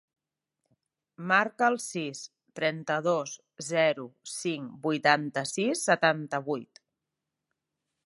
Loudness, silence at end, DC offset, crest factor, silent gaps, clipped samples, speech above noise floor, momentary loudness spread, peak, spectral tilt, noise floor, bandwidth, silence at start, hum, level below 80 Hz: -28 LUFS; 1.4 s; under 0.1%; 24 dB; none; under 0.1%; 58 dB; 14 LU; -6 dBFS; -3.5 dB/octave; -86 dBFS; 11.5 kHz; 1.2 s; none; -82 dBFS